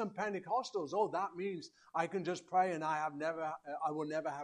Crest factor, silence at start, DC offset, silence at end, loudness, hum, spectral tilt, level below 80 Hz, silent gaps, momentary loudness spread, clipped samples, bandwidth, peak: 18 dB; 0 s; under 0.1%; 0 s; -38 LUFS; none; -5.5 dB/octave; -84 dBFS; none; 8 LU; under 0.1%; 11 kHz; -20 dBFS